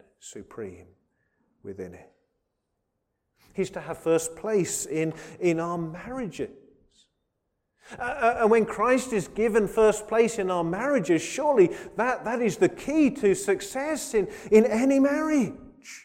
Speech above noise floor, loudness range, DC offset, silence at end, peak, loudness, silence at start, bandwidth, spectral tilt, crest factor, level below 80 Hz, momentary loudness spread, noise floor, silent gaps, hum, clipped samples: 54 dB; 10 LU; under 0.1%; 0.05 s; -6 dBFS; -25 LUFS; 0.25 s; 16 kHz; -5 dB/octave; 20 dB; -56 dBFS; 18 LU; -79 dBFS; none; none; under 0.1%